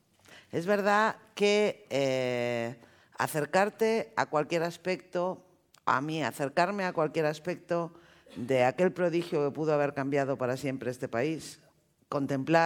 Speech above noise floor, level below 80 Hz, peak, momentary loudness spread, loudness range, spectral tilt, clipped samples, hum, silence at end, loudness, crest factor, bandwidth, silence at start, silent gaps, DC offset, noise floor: 28 dB; -76 dBFS; -8 dBFS; 9 LU; 2 LU; -5.5 dB/octave; under 0.1%; none; 0 s; -30 LUFS; 22 dB; 18 kHz; 0.3 s; none; under 0.1%; -57 dBFS